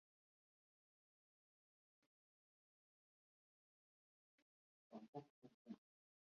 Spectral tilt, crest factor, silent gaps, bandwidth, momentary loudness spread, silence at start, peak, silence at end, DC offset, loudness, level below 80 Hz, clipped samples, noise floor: -7.5 dB/octave; 28 dB; 5.08-5.13 s, 5.30-5.42 s, 5.54-5.65 s; 6.2 kHz; 5 LU; 4.9 s; -40 dBFS; 0.45 s; under 0.1%; -61 LUFS; under -90 dBFS; under 0.1%; under -90 dBFS